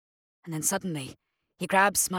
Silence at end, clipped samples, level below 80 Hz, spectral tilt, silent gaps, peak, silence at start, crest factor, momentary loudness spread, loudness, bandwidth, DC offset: 0 s; under 0.1%; -64 dBFS; -3 dB/octave; none; -8 dBFS; 0.45 s; 22 dB; 16 LU; -26 LUFS; 18.5 kHz; under 0.1%